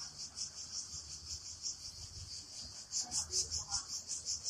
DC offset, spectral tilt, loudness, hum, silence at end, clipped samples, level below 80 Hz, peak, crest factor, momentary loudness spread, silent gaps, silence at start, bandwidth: under 0.1%; 0 dB/octave; -40 LUFS; none; 0 s; under 0.1%; -62 dBFS; -22 dBFS; 22 dB; 11 LU; none; 0 s; 15 kHz